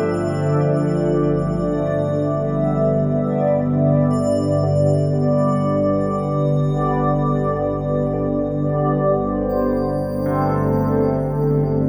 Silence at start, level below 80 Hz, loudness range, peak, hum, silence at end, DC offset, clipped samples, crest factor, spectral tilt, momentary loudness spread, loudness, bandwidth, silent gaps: 0 s; -38 dBFS; 2 LU; -6 dBFS; 50 Hz at -40 dBFS; 0 s; under 0.1%; under 0.1%; 14 dB; -9.5 dB/octave; 3 LU; -19 LUFS; 10 kHz; none